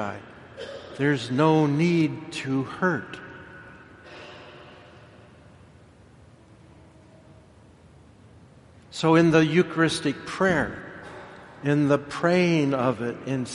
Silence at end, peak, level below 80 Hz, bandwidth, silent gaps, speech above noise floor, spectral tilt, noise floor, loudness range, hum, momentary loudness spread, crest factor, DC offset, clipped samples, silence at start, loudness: 0 s; -6 dBFS; -58 dBFS; 11.5 kHz; none; 29 dB; -6.5 dB/octave; -52 dBFS; 11 LU; none; 23 LU; 20 dB; under 0.1%; under 0.1%; 0 s; -23 LUFS